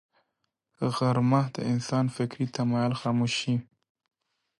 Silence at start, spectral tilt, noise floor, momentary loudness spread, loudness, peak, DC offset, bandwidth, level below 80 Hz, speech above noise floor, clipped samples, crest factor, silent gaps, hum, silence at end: 0.8 s; -6.5 dB/octave; -80 dBFS; 6 LU; -28 LUFS; -12 dBFS; under 0.1%; 11.5 kHz; -68 dBFS; 54 dB; under 0.1%; 16 dB; none; none; 1 s